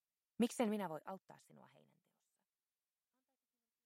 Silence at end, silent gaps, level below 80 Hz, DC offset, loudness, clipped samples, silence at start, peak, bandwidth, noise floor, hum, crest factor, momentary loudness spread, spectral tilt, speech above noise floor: 2.3 s; none; under -90 dBFS; under 0.1%; -42 LUFS; under 0.1%; 0.4 s; -24 dBFS; 16 kHz; under -90 dBFS; none; 22 dB; 23 LU; -5 dB/octave; over 47 dB